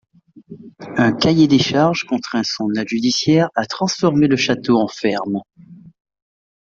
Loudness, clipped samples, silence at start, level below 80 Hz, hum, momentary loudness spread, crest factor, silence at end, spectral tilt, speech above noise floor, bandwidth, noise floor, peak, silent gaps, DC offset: -17 LUFS; under 0.1%; 0.5 s; -54 dBFS; none; 8 LU; 16 dB; 0.95 s; -5 dB/octave; 24 dB; 7.6 kHz; -41 dBFS; -2 dBFS; none; under 0.1%